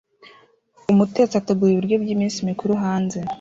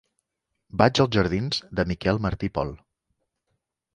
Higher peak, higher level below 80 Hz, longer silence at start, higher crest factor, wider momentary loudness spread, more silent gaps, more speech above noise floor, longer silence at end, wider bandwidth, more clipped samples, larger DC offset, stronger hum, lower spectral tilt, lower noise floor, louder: second, -6 dBFS vs -2 dBFS; second, -58 dBFS vs -44 dBFS; first, 0.9 s vs 0.75 s; second, 16 dB vs 24 dB; second, 6 LU vs 10 LU; neither; second, 35 dB vs 57 dB; second, 0.05 s vs 1.2 s; second, 7.8 kHz vs 11 kHz; neither; neither; neither; about the same, -7 dB/octave vs -6 dB/octave; second, -54 dBFS vs -80 dBFS; first, -20 LUFS vs -24 LUFS